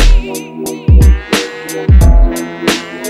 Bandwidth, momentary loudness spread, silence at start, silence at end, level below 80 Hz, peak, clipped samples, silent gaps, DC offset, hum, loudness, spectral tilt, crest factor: 14.5 kHz; 12 LU; 0 s; 0 s; -10 dBFS; 0 dBFS; under 0.1%; none; under 0.1%; none; -12 LUFS; -5.5 dB/octave; 10 dB